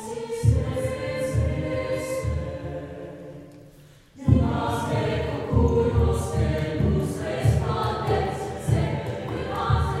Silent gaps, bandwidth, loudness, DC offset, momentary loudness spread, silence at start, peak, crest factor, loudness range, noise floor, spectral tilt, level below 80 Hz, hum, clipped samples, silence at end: none; 14 kHz; -25 LUFS; under 0.1%; 11 LU; 0 s; -6 dBFS; 20 dB; 5 LU; -50 dBFS; -7 dB/octave; -36 dBFS; none; under 0.1%; 0 s